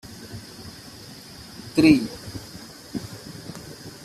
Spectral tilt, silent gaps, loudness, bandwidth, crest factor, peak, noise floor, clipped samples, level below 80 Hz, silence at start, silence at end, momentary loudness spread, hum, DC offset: -5.5 dB/octave; none; -22 LUFS; 14 kHz; 24 dB; -4 dBFS; -42 dBFS; under 0.1%; -52 dBFS; 0.05 s; 0 s; 23 LU; none; under 0.1%